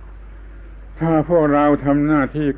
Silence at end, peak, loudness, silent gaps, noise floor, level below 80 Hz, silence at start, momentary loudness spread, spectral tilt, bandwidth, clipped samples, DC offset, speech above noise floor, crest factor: 0 s; -4 dBFS; -17 LUFS; none; -36 dBFS; -36 dBFS; 0 s; 4 LU; -12 dB/octave; 3.9 kHz; under 0.1%; under 0.1%; 20 dB; 14 dB